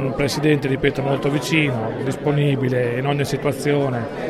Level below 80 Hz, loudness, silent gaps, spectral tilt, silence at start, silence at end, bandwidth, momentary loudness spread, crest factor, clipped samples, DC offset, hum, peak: -46 dBFS; -20 LUFS; none; -6 dB/octave; 0 s; 0 s; 14 kHz; 4 LU; 18 dB; under 0.1%; under 0.1%; none; -2 dBFS